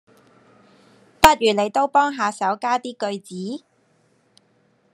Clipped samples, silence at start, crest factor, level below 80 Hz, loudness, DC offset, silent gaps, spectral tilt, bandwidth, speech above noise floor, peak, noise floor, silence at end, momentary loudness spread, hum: under 0.1%; 1.2 s; 22 dB; -46 dBFS; -20 LUFS; under 0.1%; none; -3.5 dB/octave; 13 kHz; 41 dB; 0 dBFS; -62 dBFS; 1.35 s; 16 LU; none